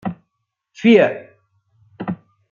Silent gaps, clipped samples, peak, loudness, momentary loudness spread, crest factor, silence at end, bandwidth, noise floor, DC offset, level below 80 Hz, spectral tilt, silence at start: none; under 0.1%; -2 dBFS; -16 LUFS; 20 LU; 18 dB; 0.35 s; 7.2 kHz; -76 dBFS; under 0.1%; -66 dBFS; -7 dB/octave; 0.05 s